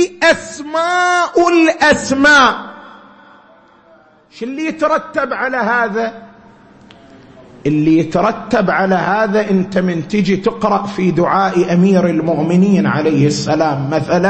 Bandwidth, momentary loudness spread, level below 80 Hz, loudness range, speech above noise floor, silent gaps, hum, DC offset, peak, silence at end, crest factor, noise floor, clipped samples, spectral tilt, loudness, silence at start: 8.8 kHz; 8 LU; -50 dBFS; 6 LU; 34 dB; none; none; under 0.1%; 0 dBFS; 0 s; 14 dB; -47 dBFS; under 0.1%; -5.5 dB/octave; -14 LUFS; 0 s